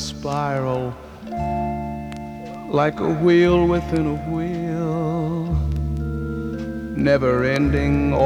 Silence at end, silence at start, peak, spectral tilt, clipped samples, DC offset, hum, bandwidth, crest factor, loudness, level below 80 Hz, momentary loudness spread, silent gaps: 0 s; 0 s; -4 dBFS; -7.5 dB/octave; under 0.1%; under 0.1%; none; 11.5 kHz; 16 dB; -21 LUFS; -32 dBFS; 13 LU; none